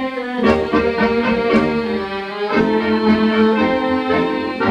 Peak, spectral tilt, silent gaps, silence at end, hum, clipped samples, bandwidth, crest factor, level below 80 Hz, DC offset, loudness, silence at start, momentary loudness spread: -4 dBFS; -7 dB/octave; none; 0 s; none; under 0.1%; 8.2 kHz; 14 dB; -42 dBFS; under 0.1%; -17 LUFS; 0 s; 7 LU